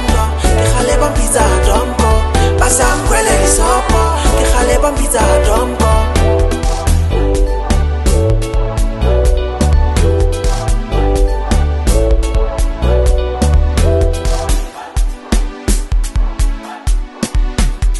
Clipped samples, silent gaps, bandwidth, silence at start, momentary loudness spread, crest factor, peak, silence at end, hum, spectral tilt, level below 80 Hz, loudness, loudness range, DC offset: under 0.1%; none; 12.5 kHz; 0 s; 7 LU; 12 dB; 0 dBFS; 0 s; none; -5 dB/octave; -14 dBFS; -14 LUFS; 4 LU; under 0.1%